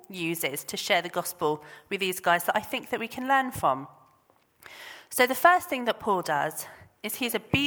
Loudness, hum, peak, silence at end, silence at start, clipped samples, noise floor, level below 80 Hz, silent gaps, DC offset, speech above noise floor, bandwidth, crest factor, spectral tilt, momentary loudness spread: -27 LUFS; none; -4 dBFS; 0 s; 0.1 s; under 0.1%; -65 dBFS; -62 dBFS; none; under 0.1%; 37 dB; over 20 kHz; 24 dB; -3 dB/octave; 15 LU